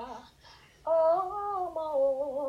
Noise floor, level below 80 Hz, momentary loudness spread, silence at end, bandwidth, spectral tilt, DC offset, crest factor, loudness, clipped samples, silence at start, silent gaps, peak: -56 dBFS; -64 dBFS; 16 LU; 0 s; 9.2 kHz; -6 dB/octave; under 0.1%; 12 dB; -29 LUFS; under 0.1%; 0 s; none; -18 dBFS